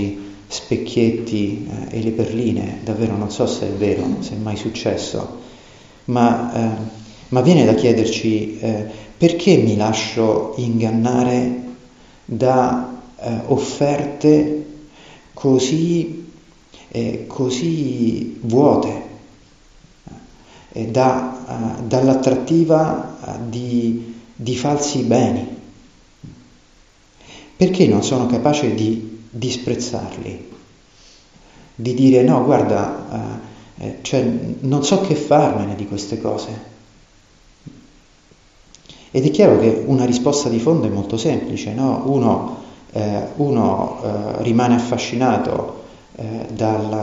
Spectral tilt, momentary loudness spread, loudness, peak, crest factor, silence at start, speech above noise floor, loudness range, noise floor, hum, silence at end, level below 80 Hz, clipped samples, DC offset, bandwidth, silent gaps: -6.5 dB/octave; 15 LU; -18 LUFS; -2 dBFS; 18 dB; 0 s; 34 dB; 5 LU; -51 dBFS; none; 0 s; -50 dBFS; under 0.1%; under 0.1%; 8 kHz; none